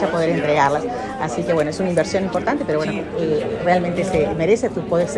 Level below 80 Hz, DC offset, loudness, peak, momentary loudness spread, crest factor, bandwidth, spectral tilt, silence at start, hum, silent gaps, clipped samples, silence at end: -44 dBFS; under 0.1%; -20 LUFS; -2 dBFS; 6 LU; 16 dB; 11.5 kHz; -6 dB/octave; 0 s; none; none; under 0.1%; 0 s